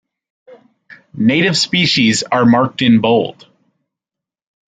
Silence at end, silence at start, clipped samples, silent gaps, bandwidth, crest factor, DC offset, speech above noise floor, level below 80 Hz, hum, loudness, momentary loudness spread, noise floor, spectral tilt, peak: 1.4 s; 0.9 s; under 0.1%; none; 9.4 kHz; 14 dB; under 0.1%; 73 dB; -54 dBFS; none; -13 LUFS; 4 LU; -86 dBFS; -4.5 dB/octave; -2 dBFS